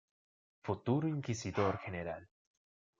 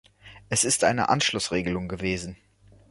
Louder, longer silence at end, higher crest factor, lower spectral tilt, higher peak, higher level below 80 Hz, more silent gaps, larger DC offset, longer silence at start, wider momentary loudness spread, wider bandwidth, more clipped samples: second, -37 LUFS vs -24 LUFS; first, 0.75 s vs 0.55 s; about the same, 22 dB vs 20 dB; first, -6.5 dB/octave vs -3 dB/octave; second, -18 dBFS vs -6 dBFS; second, -72 dBFS vs -50 dBFS; neither; neither; first, 0.65 s vs 0.25 s; about the same, 11 LU vs 9 LU; second, 7.6 kHz vs 12 kHz; neither